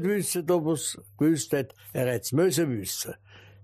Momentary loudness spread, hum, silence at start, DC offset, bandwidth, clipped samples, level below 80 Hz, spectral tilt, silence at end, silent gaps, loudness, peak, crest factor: 9 LU; none; 0 s; under 0.1%; 15.5 kHz; under 0.1%; -66 dBFS; -5 dB/octave; 0.25 s; none; -27 LUFS; -12 dBFS; 14 dB